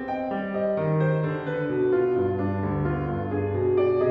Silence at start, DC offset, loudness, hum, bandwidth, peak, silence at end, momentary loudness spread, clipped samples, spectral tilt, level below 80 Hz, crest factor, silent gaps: 0 s; under 0.1%; -25 LUFS; none; 4.8 kHz; -12 dBFS; 0 s; 5 LU; under 0.1%; -11 dB/octave; -48 dBFS; 12 dB; none